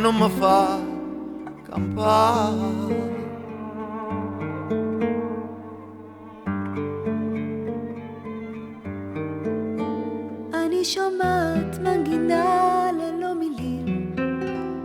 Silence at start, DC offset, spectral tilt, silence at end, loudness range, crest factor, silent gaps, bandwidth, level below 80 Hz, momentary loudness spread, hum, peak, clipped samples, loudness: 0 s; under 0.1%; -6 dB/octave; 0 s; 8 LU; 18 dB; none; 20 kHz; -54 dBFS; 15 LU; none; -6 dBFS; under 0.1%; -25 LUFS